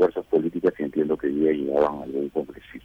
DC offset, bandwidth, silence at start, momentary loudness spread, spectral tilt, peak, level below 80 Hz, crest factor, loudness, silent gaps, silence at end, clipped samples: under 0.1%; 5.8 kHz; 0 s; 7 LU; -8.5 dB/octave; -10 dBFS; -56 dBFS; 14 dB; -24 LUFS; none; 0.05 s; under 0.1%